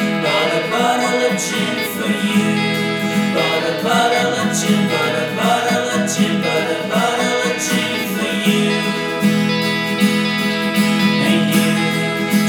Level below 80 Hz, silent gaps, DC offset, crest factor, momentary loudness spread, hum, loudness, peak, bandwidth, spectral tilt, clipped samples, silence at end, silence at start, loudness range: -60 dBFS; none; under 0.1%; 14 dB; 4 LU; none; -16 LUFS; -2 dBFS; over 20 kHz; -4 dB/octave; under 0.1%; 0 s; 0 s; 1 LU